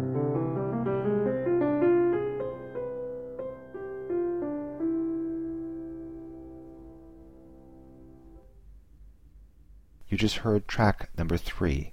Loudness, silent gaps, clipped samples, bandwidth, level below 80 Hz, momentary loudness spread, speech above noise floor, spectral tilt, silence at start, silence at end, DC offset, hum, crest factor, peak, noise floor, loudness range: -30 LUFS; none; under 0.1%; 15 kHz; -44 dBFS; 18 LU; 27 dB; -7 dB/octave; 0 s; 0 s; under 0.1%; none; 20 dB; -10 dBFS; -54 dBFS; 18 LU